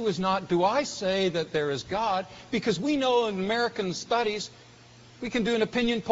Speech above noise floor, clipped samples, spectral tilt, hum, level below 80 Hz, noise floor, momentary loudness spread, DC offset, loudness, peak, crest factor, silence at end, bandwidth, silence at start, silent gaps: 25 dB; under 0.1%; -3.5 dB/octave; none; -58 dBFS; -52 dBFS; 7 LU; under 0.1%; -27 LUFS; -8 dBFS; 18 dB; 0 s; 8 kHz; 0 s; none